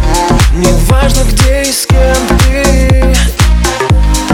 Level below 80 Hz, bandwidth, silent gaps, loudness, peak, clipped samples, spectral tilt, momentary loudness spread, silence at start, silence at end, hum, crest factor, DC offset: -10 dBFS; 17 kHz; none; -9 LUFS; 0 dBFS; 0.3%; -4.5 dB/octave; 2 LU; 0 s; 0 s; none; 8 dB; under 0.1%